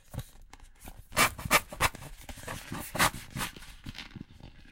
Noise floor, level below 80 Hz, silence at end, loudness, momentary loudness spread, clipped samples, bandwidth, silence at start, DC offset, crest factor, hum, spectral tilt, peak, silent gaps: -52 dBFS; -48 dBFS; 0 s; -29 LUFS; 23 LU; under 0.1%; 17 kHz; 0.1 s; under 0.1%; 26 dB; none; -2.5 dB/octave; -8 dBFS; none